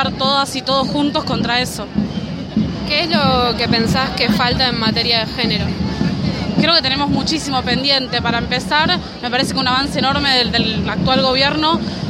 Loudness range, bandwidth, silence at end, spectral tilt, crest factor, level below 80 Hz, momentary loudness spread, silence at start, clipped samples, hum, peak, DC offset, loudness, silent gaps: 2 LU; 16 kHz; 0 s; -4.5 dB/octave; 16 dB; -36 dBFS; 7 LU; 0 s; under 0.1%; none; 0 dBFS; under 0.1%; -16 LUFS; none